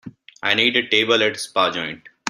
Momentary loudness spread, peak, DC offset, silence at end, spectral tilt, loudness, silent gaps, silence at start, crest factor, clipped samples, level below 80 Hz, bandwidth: 11 LU; -2 dBFS; under 0.1%; 0 s; -2.5 dB/octave; -18 LUFS; none; 0.05 s; 20 dB; under 0.1%; -64 dBFS; 14 kHz